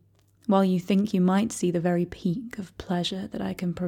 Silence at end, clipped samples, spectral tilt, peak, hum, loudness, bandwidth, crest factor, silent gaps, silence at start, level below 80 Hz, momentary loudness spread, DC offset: 0 s; under 0.1%; -6.5 dB/octave; -10 dBFS; none; -26 LUFS; 15 kHz; 16 dB; none; 0.5 s; -56 dBFS; 10 LU; under 0.1%